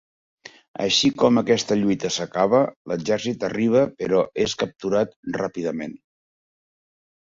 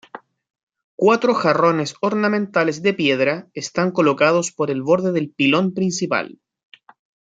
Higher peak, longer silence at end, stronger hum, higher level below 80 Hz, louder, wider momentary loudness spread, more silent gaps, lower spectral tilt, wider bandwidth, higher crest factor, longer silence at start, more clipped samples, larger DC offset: about the same, -4 dBFS vs -2 dBFS; first, 1.35 s vs 0.95 s; neither; first, -58 dBFS vs -66 dBFS; second, -22 LUFS vs -19 LUFS; first, 10 LU vs 6 LU; second, 2.76-2.85 s, 5.16-5.23 s vs 0.50-0.54 s, 0.63-0.67 s, 0.84-0.98 s; about the same, -4.5 dB/octave vs -5 dB/octave; second, 7.8 kHz vs 9.4 kHz; about the same, 18 dB vs 18 dB; first, 0.8 s vs 0.15 s; neither; neither